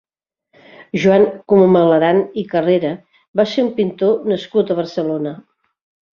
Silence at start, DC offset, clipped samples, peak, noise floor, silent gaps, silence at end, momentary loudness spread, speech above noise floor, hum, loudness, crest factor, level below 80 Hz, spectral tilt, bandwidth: 0.8 s; under 0.1%; under 0.1%; -2 dBFS; -71 dBFS; 3.28-3.34 s; 0.75 s; 12 LU; 56 dB; none; -16 LUFS; 14 dB; -58 dBFS; -7.5 dB/octave; 7 kHz